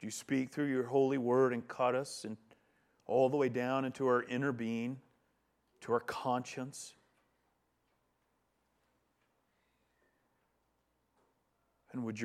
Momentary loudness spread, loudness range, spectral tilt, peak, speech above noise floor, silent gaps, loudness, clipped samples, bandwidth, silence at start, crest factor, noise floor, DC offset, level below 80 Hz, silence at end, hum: 16 LU; 11 LU; -5.5 dB/octave; -18 dBFS; 45 dB; none; -35 LUFS; under 0.1%; 14 kHz; 0 s; 20 dB; -79 dBFS; under 0.1%; -82 dBFS; 0 s; none